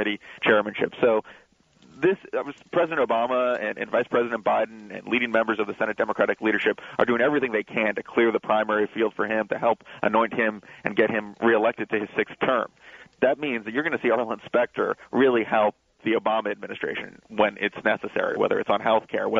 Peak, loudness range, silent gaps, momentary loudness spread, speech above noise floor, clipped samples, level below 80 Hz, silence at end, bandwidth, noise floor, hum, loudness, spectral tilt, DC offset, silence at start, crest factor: -4 dBFS; 2 LU; none; 6 LU; 33 dB; under 0.1%; -68 dBFS; 0 s; 7.6 kHz; -57 dBFS; none; -24 LUFS; -6.5 dB/octave; under 0.1%; 0 s; 20 dB